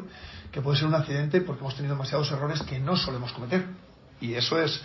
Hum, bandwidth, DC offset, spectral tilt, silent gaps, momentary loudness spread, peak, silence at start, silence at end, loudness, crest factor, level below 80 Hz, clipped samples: none; 6.2 kHz; under 0.1%; -6 dB/octave; none; 13 LU; -10 dBFS; 0 s; 0 s; -28 LUFS; 18 dB; -52 dBFS; under 0.1%